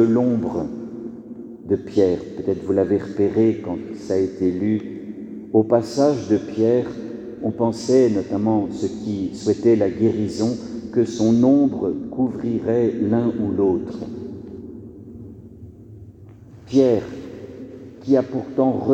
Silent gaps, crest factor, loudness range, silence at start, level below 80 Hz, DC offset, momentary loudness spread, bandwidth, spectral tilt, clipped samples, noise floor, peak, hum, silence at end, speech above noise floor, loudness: none; 18 dB; 6 LU; 0 s; -54 dBFS; under 0.1%; 19 LU; 9 kHz; -7.5 dB/octave; under 0.1%; -43 dBFS; -4 dBFS; none; 0 s; 24 dB; -20 LUFS